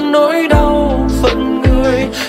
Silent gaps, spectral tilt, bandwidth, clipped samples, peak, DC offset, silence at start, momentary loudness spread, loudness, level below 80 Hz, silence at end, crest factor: none; -6.5 dB/octave; 16 kHz; under 0.1%; 0 dBFS; under 0.1%; 0 s; 3 LU; -12 LUFS; -18 dBFS; 0 s; 10 dB